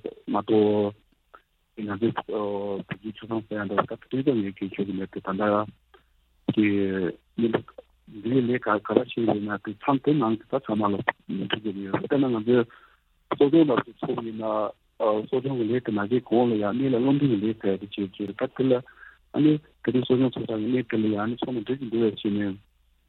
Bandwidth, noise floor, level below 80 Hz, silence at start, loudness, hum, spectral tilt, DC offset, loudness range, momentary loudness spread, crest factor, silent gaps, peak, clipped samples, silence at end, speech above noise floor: 4.3 kHz; -63 dBFS; -64 dBFS; 0.05 s; -26 LUFS; none; -10 dB/octave; under 0.1%; 4 LU; 9 LU; 24 dB; none; -2 dBFS; under 0.1%; 0.5 s; 38 dB